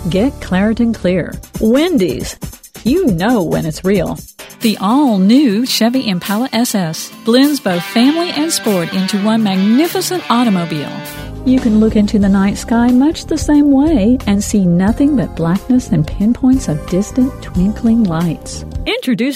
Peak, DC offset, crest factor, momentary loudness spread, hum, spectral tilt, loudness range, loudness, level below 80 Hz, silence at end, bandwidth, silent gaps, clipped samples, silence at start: 0 dBFS; under 0.1%; 14 dB; 9 LU; none; -5.5 dB/octave; 3 LU; -14 LUFS; -32 dBFS; 0 s; 16.5 kHz; none; under 0.1%; 0 s